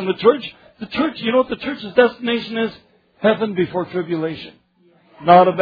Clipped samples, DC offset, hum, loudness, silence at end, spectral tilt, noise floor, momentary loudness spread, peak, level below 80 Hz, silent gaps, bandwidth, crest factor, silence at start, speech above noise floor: under 0.1%; under 0.1%; none; -19 LUFS; 0 s; -8.5 dB/octave; -56 dBFS; 13 LU; 0 dBFS; -58 dBFS; none; 5 kHz; 18 dB; 0 s; 39 dB